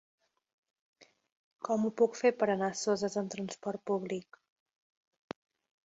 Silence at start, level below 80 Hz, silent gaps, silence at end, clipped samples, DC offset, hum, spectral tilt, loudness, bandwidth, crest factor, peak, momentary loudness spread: 1 s; -78 dBFS; 1.32-1.51 s; 1.65 s; under 0.1%; under 0.1%; none; -5 dB/octave; -33 LUFS; 8 kHz; 20 dB; -14 dBFS; 19 LU